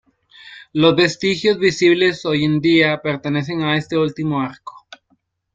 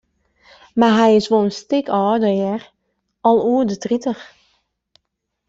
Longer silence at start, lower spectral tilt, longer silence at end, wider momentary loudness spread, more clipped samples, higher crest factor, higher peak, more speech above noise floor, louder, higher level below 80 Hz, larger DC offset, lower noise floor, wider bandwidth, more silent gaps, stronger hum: second, 0.45 s vs 0.75 s; about the same, -5.5 dB/octave vs -6 dB/octave; second, 0.75 s vs 1.25 s; about the same, 9 LU vs 11 LU; neither; about the same, 18 dB vs 16 dB; about the same, -2 dBFS vs -2 dBFS; second, 47 dB vs 60 dB; about the same, -17 LUFS vs -17 LUFS; about the same, -56 dBFS vs -58 dBFS; neither; second, -64 dBFS vs -76 dBFS; about the same, 7.8 kHz vs 7.8 kHz; neither; neither